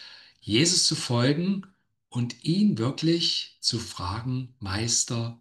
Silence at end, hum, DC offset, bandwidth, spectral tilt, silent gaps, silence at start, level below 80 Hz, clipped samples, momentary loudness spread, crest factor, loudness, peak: 0.05 s; none; under 0.1%; 12.5 kHz; -4 dB/octave; none; 0 s; -62 dBFS; under 0.1%; 12 LU; 18 dB; -25 LUFS; -8 dBFS